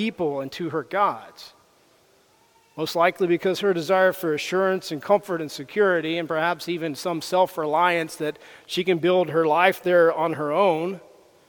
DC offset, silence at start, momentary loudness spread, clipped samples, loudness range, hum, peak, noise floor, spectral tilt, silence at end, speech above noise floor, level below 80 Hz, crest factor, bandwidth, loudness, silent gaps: under 0.1%; 0 s; 11 LU; under 0.1%; 4 LU; none; -4 dBFS; -59 dBFS; -5 dB/octave; 0.5 s; 37 dB; -72 dBFS; 20 dB; 19 kHz; -23 LUFS; none